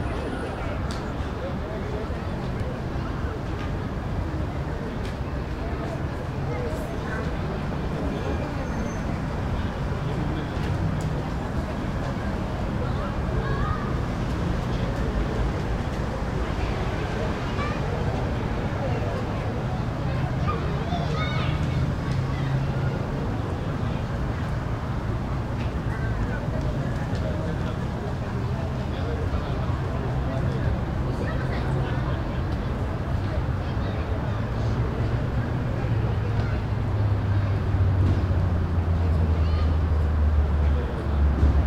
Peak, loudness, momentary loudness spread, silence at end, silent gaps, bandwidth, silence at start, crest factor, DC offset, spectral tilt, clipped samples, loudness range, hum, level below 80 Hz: -10 dBFS; -27 LUFS; 6 LU; 0 s; none; 10.5 kHz; 0 s; 16 dB; under 0.1%; -7.5 dB/octave; under 0.1%; 6 LU; none; -32 dBFS